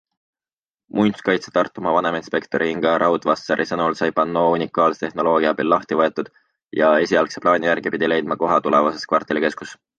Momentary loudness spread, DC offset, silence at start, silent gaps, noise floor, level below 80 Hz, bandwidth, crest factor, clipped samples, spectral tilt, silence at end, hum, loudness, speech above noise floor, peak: 5 LU; under 0.1%; 0.95 s; 6.64-6.68 s; under -90 dBFS; -60 dBFS; 9 kHz; 18 dB; under 0.1%; -5.5 dB/octave; 0.25 s; none; -19 LUFS; over 71 dB; -2 dBFS